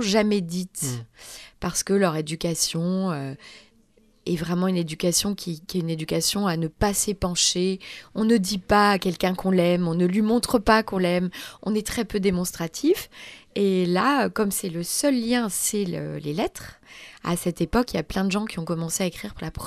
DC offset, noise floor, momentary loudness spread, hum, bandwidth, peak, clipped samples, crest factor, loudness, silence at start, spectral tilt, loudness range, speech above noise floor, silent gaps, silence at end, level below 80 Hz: under 0.1%; -59 dBFS; 12 LU; none; 14.5 kHz; -6 dBFS; under 0.1%; 20 dB; -24 LUFS; 0 s; -4.5 dB/octave; 5 LU; 35 dB; none; 0 s; -46 dBFS